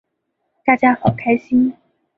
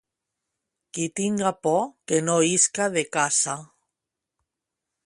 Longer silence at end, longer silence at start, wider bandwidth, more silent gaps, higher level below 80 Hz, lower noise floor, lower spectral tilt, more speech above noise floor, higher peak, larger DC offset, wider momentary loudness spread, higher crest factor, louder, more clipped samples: second, 0.45 s vs 1.4 s; second, 0.65 s vs 0.95 s; second, 4 kHz vs 11.5 kHz; neither; first, -52 dBFS vs -70 dBFS; second, -73 dBFS vs -85 dBFS; first, -9.5 dB/octave vs -3 dB/octave; second, 57 dB vs 62 dB; first, -2 dBFS vs -6 dBFS; neither; second, 7 LU vs 10 LU; about the same, 16 dB vs 20 dB; first, -17 LUFS vs -23 LUFS; neither